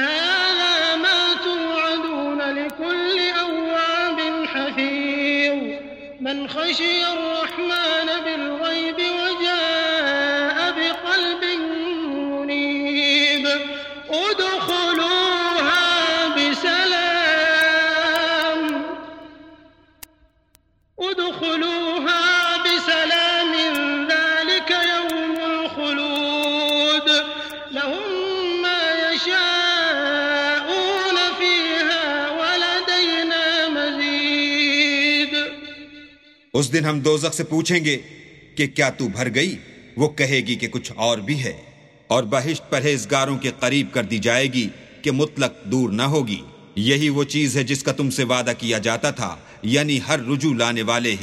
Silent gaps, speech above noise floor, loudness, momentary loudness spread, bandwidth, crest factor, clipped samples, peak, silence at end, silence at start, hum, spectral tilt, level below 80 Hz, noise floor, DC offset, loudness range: none; 39 dB; -19 LUFS; 8 LU; 16 kHz; 20 dB; under 0.1%; -2 dBFS; 0 s; 0 s; none; -3.5 dB/octave; -60 dBFS; -60 dBFS; under 0.1%; 4 LU